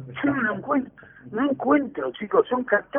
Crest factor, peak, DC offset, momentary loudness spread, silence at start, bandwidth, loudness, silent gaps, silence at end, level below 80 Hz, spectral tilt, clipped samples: 18 dB; -6 dBFS; under 0.1%; 9 LU; 0 s; 3.6 kHz; -24 LUFS; none; 0 s; -62 dBFS; -10.5 dB/octave; under 0.1%